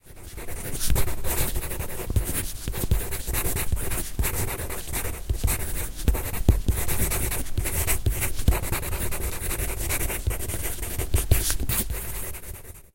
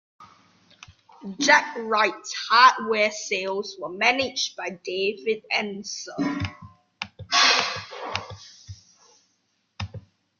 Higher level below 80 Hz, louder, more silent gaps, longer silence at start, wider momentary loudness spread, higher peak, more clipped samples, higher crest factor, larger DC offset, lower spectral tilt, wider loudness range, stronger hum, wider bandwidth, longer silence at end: first, -30 dBFS vs -64 dBFS; second, -27 LUFS vs -22 LUFS; neither; second, 0.05 s vs 0.2 s; second, 7 LU vs 20 LU; about the same, -2 dBFS vs -2 dBFS; neither; about the same, 22 dB vs 22 dB; neither; first, -4 dB/octave vs -2 dB/octave; second, 2 LU vs 5 LU; neither; first, 17 kHz vs 7.4 kHz; second, 0.1 s vs 0.4 s